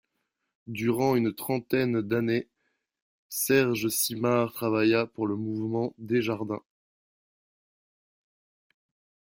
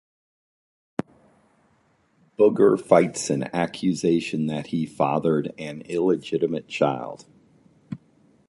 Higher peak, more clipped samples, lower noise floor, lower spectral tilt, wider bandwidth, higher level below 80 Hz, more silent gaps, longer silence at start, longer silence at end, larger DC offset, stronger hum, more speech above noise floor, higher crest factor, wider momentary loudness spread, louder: second, -10 dBFS vs -2 dBFS; neither; first, -81 dBFS vs -64 dBFS; about the same, -5 dB/octave vs -6 dB/octave; first, 16.5 kHz vs 11.5 kHz; about the same, -68 dBFS vs -64 dBFS; first, 3.02-3.30 s vs none; second, 0.65 s vs 2.4 s; first, 2.8 s vs 0.5 s; neither; neither; first, 54 dB vs 42 dB; about the same, 18 dB vs 22 dB; second, 8 LU vs 19 LU; second, -27 LUFS vs -23 LUFS